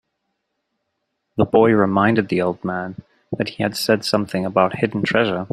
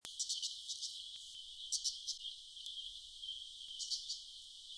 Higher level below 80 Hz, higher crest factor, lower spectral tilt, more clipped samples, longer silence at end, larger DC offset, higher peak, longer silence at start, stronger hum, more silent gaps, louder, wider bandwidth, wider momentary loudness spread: first, -56 dBFS vs -76 dBFS; second, 18 dB vs 24 dB; first, -6 dB/octave vs 4 dB/octave; neither; about the same, 0.05 s vs 0 s; neither; first, -2 dBFS vs -22 dBFS; first, 1.35 s vs 0.05 s; neither; neither; first, -19 LUFS vs -43 LUFS; first, 16 kHz vs 11 kHz; about the same, 11 LU vs 10 LU